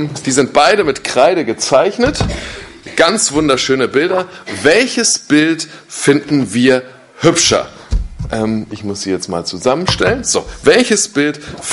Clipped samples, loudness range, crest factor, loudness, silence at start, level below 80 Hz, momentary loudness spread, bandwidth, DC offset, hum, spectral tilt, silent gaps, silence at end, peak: under 0.1%; 3 LU; 14 dB; -13 LUFS; 0 s; -32 dBFS; 12 LU; 11.5 kHz; under 0.1%; none; -3.5 dB/octave; none; 0 s; 0 dBFS